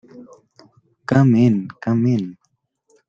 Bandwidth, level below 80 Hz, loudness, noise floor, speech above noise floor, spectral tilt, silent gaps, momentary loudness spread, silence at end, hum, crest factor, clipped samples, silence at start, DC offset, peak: 7.4 kHz; -58 dBFS; -17 LUFS; -69 dBFS; 53 dB; -9 dB/octave; none; 14 LU; 0.75 s; none; 18 dB; under 0.1%; 0.15 s; under 0.1%; -2 dBFS